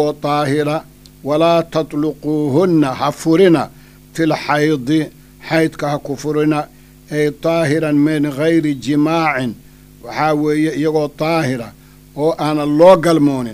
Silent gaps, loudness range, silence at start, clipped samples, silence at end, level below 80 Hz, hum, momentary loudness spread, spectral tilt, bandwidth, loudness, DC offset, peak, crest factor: none; 3 LU; 0 s; under 0.1%; 0 s; -48 dBFS; none; 13 LU; -6.5 dB/octave; 15.5 kHz; -15 LUFS; under 0.1%; 0 dBFS; 16 dB